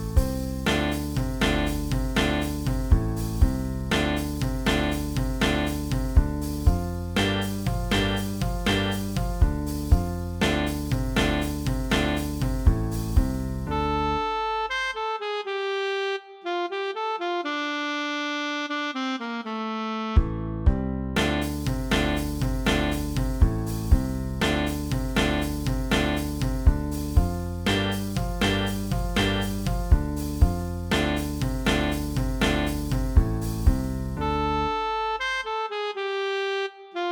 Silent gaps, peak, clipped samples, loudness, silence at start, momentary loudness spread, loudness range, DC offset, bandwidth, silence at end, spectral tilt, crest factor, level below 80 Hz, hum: none; -6 dBFS; under 0.1%; -26 LUFS; 0 s; 5 LU; 2 LU; under 0.1%; over 20 kHz; 0 s; -5.5 dB/octave; 20 dB; -30 dBFS; none